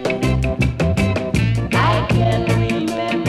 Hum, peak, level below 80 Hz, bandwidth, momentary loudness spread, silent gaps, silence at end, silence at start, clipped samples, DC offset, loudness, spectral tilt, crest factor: none; -6 dBFS; -28 dBFS; 13 kHz; 3 LU; none; 0 s; 0 s; under 0.1%; under 0.1%; -18 LUFS; -6.5 dB/octave; 12 dB